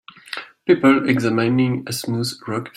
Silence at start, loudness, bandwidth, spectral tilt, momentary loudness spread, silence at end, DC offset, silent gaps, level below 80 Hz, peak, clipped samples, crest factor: 0.3 s; -19 LUFS; 16 kHz; -6 dB/octave; 16 LU; 0.05 s; under 0.1%; none; -60 dBFS; -2 dBFS; under 0.1%; 18 dB